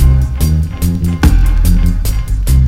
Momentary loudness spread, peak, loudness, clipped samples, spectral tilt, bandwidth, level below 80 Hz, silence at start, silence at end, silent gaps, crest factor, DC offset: 5 LU; 0 dBFS; -14 LUFS; 0.2%; -6.5 dB/octave; 16.5 kHz; -12 dBFS; 0 s; 0 s; none; 10 dB; under 0.1%